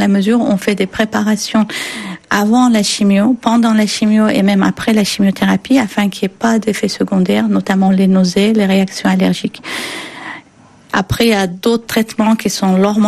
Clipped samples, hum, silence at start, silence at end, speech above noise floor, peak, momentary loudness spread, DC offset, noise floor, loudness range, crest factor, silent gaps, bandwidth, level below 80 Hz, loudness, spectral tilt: under 0.1%; none; 0 s; 0 s; 31 dB; 0 dBFS; 9 LU; under 0.1%; -44 dBFS; 4 LU; 12 dB; none; 14 kHz; -46 dBFS; -13 LUFS; -5.5 dB/octave